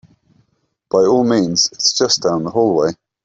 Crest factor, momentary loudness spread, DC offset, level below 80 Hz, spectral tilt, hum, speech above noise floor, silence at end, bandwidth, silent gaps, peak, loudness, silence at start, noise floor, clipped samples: 16 dB; 5 LU; under 0.1%; -56 dBFS; -3.5 dB/octave; none; 51 dB; 0.3 s; 8 kHz; none; -2 dBFS; -15 LUFS; 0.95 s; -65 dBFS; under 0.1%